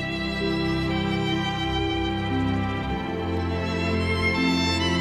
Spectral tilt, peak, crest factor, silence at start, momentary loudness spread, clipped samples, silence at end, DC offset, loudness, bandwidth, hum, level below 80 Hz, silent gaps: -5.5 dB/octave; -12 dBFS; 14 dB; 0 s; 5 LU; under 0.1%; 0 s; under 0.1%; -25 LUFS; 13 kHz; none; -38 dBFS; none